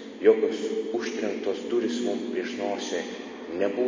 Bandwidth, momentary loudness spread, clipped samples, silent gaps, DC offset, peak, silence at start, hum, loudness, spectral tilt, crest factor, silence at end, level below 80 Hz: 7.6 kHz; 10 LU; under 0.1%; none; under 0.1%; -6 dBFS; 0 s; none; -28 LUFS; -4 dB/octave; 20 dB; 0 s; -72 dBFS